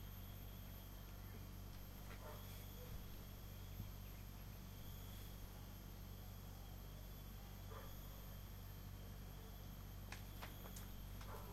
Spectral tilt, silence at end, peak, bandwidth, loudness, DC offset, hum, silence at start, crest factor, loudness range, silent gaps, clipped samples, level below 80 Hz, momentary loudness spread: -5 dB/octave; 0 s; -34 dBFS; 16 kHz; -55 LUFS; under 0.1%; none; 0 s; 20 dB; 1 LU; none; under 0.1%; -56 dBFS; 2 LU